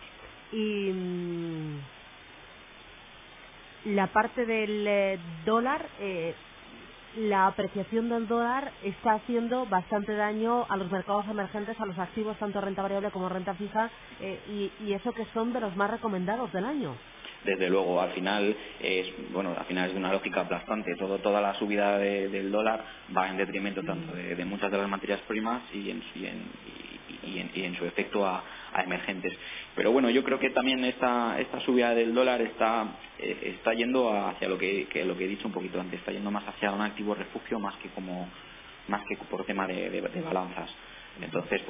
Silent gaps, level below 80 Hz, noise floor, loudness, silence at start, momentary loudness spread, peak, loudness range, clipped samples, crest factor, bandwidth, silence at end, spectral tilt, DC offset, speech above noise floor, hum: none; -62 dBFS; -50 dBFS; -30 LUFS; 0 s; 15 LU; -10 dBFS; 7 LU; under 0.1%; 20 dB; 3.8 kHz; 0 s; -3.5 dB/octave; under 0.1%; 20 dB; none